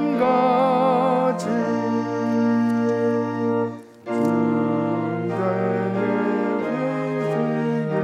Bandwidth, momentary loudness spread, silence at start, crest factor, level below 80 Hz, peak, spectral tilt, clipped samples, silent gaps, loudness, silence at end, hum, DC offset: 10 kHz; 6 LU; 0 s; 12 dB; -76 dBFS; -8 dBFS; -8 dB/octave; under 0.1%; none; -22 LUFS; 0 s; none; under 0.1%